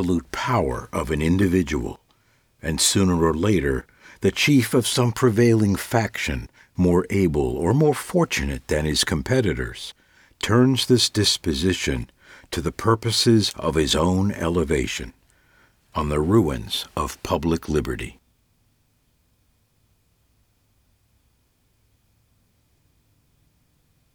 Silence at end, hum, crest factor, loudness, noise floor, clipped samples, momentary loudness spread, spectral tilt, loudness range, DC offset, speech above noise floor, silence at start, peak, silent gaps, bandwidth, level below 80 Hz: 6.05 s; none; 18 dB; -21 LUFS; -65 dBFS; under 0.1%; 12 LU; -5 dB/octave; 5 LU; under 0.1%; 44 dB; 0 s; -6 dBFS; none; over 20 kHz; -38 dBFS